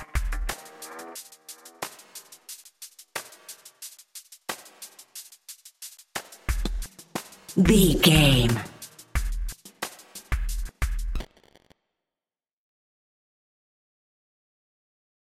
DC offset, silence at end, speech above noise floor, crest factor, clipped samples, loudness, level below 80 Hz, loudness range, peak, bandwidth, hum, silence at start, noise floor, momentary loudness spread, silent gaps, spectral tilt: under 0.1%; 4.1 s; over 72 dB; 24 dB; under 0.1%; -26 LUFS; -34 dBFS; 18 LU; -4 dBFS; 16.5 kHz; none; 0 s; under -90 dBFS; 25 LU; none; -4.5 dB/octave